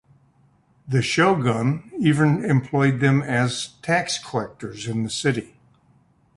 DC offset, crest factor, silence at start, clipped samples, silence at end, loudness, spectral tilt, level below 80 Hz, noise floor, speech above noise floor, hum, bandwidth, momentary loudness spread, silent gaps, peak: under 0.1%; 18 dB; 0.85 s; under 0.1%; 0.9 s; -22 LUFS; -5.5 dB/octave; -56 dBFS; -59 dBFS; 38 dB; none; 11.5 kHz; 10 LU; none; -4 dBFS